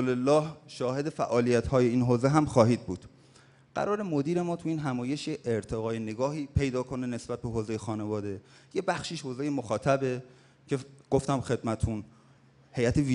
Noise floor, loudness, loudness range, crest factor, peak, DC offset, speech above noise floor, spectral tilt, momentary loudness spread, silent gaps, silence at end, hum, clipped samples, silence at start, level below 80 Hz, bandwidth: -59 dBFS; -30 LUFS; 6 LU; 22 dB; -6 dBFS; under 0.1%; 31 dB; -6.5 dB/octave; 10 LU; none; 0 s; none; under 0.1%; 0 s; -50 dBFS; 11 kHz